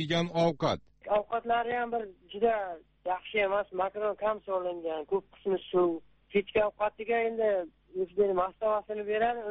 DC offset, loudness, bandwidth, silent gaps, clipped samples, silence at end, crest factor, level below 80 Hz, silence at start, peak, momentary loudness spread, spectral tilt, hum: under 0.1%; -31 LUFS; 8 kHz; none; under 0.1%; 0 s; 18 dB; -62 dBFS; 0 s; -14 dBFS; 8 LU; -4 dB/octave; none